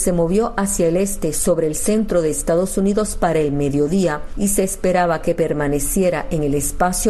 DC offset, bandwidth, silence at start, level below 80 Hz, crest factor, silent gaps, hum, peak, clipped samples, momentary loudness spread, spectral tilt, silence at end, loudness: under 0.1%; 13 kHz; 0 s; -32 dBFS; 14 dB; none; none; -4 dBFS; under 0.1%; 2 LU; -5 dB/octave; 0 s; -18 LUFS